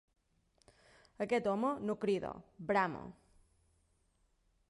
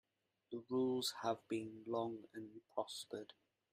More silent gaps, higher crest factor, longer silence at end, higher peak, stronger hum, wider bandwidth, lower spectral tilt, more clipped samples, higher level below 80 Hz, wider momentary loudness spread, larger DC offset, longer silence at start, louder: neither; about the same, 20 dB vs 18 dB; first, 1.55 s vs 0.4 s; first, -20 dBFS vs -26 dBFS; neither; second, 11.5 kHz vs 15.5 kHz; first, -6.5 dB/octave vs -4.5 dB/octave; neither; first, -70 dBFS vs -86 dBFS; about the same, 13 LU vs 13 LU; neither; first, 1.2 s vs 0.5 s; first, -36 LUFS vs -44 LUFS